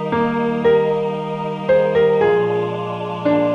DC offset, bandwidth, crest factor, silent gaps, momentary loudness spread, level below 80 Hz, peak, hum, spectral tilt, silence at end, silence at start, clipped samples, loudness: under 0.1%; 6.8 kHz; 12 dB; none; 9 LU; -52 dBFS; -6 dBFS; none; -8 dB/octave; 0 s; 0 s; under 0.1%; -18 LUFS